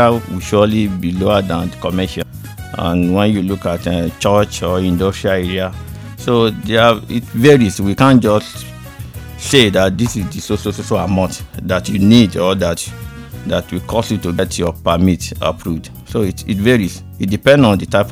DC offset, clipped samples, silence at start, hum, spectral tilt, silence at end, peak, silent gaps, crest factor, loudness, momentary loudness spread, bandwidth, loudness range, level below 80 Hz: under 0.1%; 0.3%; 0 s; none; -5.5 dB/octave; 0 s; 0 dBFS; none; 14 dB; -15 LUFS; 15 LU; 17 kHz; 4 LU; -38 dBFS